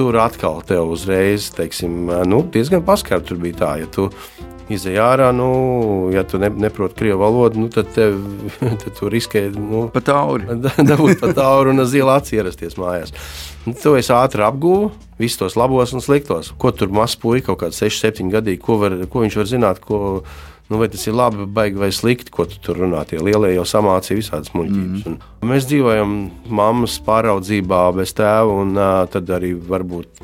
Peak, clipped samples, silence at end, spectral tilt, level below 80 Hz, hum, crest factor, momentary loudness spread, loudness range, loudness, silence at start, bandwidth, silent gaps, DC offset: 0 dBFS; under 0.1%; 0.2 s; -6 dB/octave; -40 dBFS; none; 16 dB; 10 LU; 3 LU; -17 LUFS; 0 s; 17 kHz; none; under 0.1%